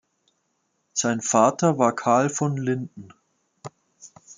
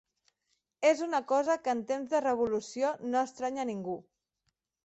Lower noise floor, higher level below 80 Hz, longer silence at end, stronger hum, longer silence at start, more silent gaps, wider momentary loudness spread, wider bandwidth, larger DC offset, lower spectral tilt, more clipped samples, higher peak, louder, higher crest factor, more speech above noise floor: second, -73 dBFS vs -82 dBFS; about the same, -70 dBFS vs -74 dBFS; second, 0.05 s vs 0.85 s; neither; first, 0.95 s vs 0.8 s; neither; first, 24 LU vs 7 LU; first, 10 kHz vs 8.2 kHz; neither; about the same, -5 dB/octave vs -4.5 dB/octave; neither; first, -4 dBFS vs -12 dBFS; first, -22 LUFS vs -31 LUFS; about the same, 22 dB vs 20 dB; about the same, 51 dB vs 51 dB